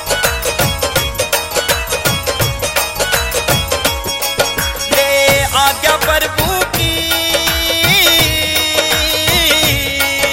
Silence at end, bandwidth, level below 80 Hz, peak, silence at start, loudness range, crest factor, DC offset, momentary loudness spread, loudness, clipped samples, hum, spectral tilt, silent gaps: 0 s; 17 kHz; -28 dBFS; 0 dBFS; 0 s; 4 LU; 14 dB; under 0.1%; 5 LU; -12 LUFS; under 0.1%; none; -2 dB/octave; none